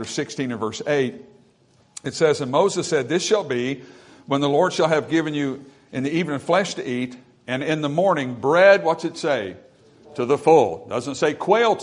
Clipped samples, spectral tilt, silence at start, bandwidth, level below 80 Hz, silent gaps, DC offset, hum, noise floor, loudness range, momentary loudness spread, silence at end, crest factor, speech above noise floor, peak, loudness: under 0.1%; -5 dB/octave; 0 s; 11 kHz; -66 dBFS; none; under 0.1%; none; -58 dBFS; 4 LU; 13 LU; 0 s; 20 dB; 37 dB; -2 dBFS; -21 LUFS